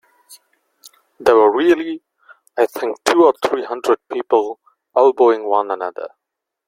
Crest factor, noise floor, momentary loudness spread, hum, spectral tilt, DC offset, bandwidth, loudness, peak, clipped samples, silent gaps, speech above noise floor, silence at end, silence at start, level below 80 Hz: 18 dB; -55 dBFS; 15 LU; none; -3.5 dB/octave; under 0.1%; 16 kHz; -16 LUFS; 0 dBFS; under 0.1%; none; 39 dB; 0.6 s; 0.3 s; -62 dBFS